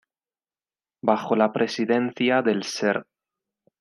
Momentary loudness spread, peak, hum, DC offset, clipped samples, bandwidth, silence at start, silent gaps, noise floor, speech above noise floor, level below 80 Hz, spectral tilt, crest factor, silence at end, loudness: 4 LU; -4 dBFS; none; under 0.1%; under 0.1%; 12 kHz; 1.05 s; none; under -90 dBFS; over 68 dB; -76 dBFS; -5 dB/octave; 20 dB; 0.8 s; -23 LUFS